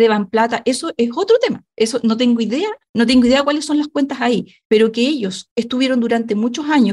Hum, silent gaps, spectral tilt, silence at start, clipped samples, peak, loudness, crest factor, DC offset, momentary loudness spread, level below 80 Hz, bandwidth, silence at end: none; 2.89-2.94 s, 4.65-4.70 s, 5.51-5.56 s; -4.5 dB/octave; 0 s; under 0.1%; -4 dBFS; -17 LUFS; 12 dB; under 0.1%; 8 LU; -52 dBFS; 12 kHz; 0 s